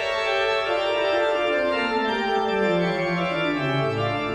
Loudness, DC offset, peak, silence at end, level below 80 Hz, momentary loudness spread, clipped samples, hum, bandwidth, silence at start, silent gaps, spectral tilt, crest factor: -23 LUFS; under 0.1%; -10 dBFS; 0 s; -54 dBFS; 2 LU; under 0.1%; none; 10 kHz; 0 s; none; -5.5 dB/octave; 12 dB